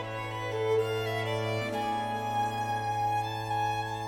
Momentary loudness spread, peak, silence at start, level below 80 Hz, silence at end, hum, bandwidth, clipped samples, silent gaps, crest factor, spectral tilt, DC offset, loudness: 3 LU; -18 dBFS; 0 s; -58 dBFS; 0 s; none; 19.5 kHz; under 0.1%; none; 12 dB; -5 dB/octave; under 0.1%; -31 LUFS